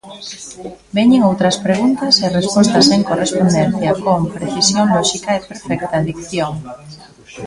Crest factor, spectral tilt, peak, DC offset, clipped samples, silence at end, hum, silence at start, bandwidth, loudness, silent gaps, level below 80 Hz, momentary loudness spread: 16 dB; -4.5 dB/octave; 0 dBFS; under 0.1%; under 0.1%; 0 s; none; 0.05 s; 11.5 kHz; -14 LUFS; none; -46 dBFS; 17 LU